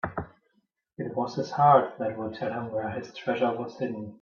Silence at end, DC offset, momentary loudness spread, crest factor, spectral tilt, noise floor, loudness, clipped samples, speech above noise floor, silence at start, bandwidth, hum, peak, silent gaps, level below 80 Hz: 0.05 s; under 0.1%; 15 LU; 22 dB; -7 dB/octave; -73 dBFS; -27 LUFS; under 0.1%; 46 dB; 0.05 s; 7 kHz; none; -8 dBFS; none; -62 dBFS